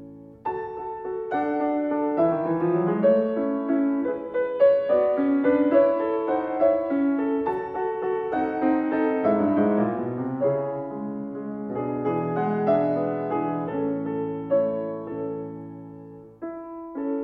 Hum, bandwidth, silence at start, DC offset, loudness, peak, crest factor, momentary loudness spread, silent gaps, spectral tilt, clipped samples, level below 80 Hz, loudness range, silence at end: none; 4.7 kHz; 0 s; under 0.1%; -24 LUFS; -8 dBFS; 16 dB; 12 LU; none; -10.5 dB/octave; under 0.1%; -62 dBFS; 5 LU; 0 s